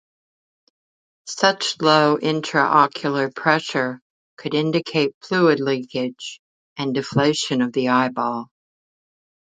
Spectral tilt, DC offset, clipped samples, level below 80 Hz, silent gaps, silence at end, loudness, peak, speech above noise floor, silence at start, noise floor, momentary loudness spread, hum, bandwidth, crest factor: -4.5 dB/octave; under 0.1%; under 0.1%; -66 dBFS; 4.02-4.37 s, 5.14-5.21 s, 6.39-6.76 s; 1.1 s; -20 LUFS; 0 dBFS; over 70 dB; 1.25 s; under -90 dBFS; 14 LU; none; 9.4 kHz; 22 dB